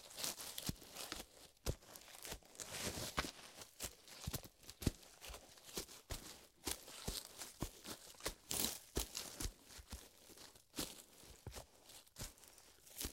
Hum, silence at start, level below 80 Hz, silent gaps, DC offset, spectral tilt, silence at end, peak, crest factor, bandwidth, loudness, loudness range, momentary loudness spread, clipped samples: none; 0 s; -58 dBFS; none; under 0.1%; -2.5 dB/octave; 0 s; -18 dBFS; 32 dB; 17 kHz; -48 LUFS; 6 LU; 14 LU; under 0.1%